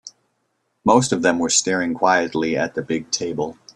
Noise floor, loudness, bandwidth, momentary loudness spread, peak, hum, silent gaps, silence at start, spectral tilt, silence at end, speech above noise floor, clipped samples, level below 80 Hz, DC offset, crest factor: -71 dBFS; -19 LUFS; 11.5 kHz; 8 LU; -2 dBFS; none; none; 0.05 s; -3.5 dB/octave; 0.25 s; 51 dB; under 0.1%; -58 dBFS; under 0.1%; 20 dB